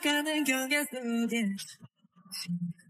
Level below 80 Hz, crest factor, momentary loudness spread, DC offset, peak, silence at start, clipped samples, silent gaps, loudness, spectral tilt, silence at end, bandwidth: -80 dBFS; 18 dB; 12 LU; under 0.1%; -14 dBFS; 0 s; under 0.1%; none; -31 LUFS; -3.5 dB/octave; 0.2 s; 16 kHz